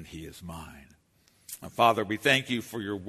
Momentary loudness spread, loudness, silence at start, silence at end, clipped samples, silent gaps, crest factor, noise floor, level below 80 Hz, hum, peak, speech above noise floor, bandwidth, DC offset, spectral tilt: 20 LU; -26 LUFS; 0 s; 0 s; under 0.1%; none; 22 dB; -65 dBFS; -58 dBFS; none; -8 dBFS; 36 dB; 13.5 kHz; under 0.1%; -4 dB/octave